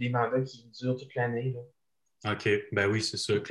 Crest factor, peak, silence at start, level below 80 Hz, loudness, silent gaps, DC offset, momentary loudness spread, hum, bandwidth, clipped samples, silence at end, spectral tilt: 16 dB; -14 dBFS; 0 s; -62 dBFS; -30 LUFS; none; under 0.1%; 9 LU; none; 12 kHz; under 0.1%; 0 s; -5 dB/octave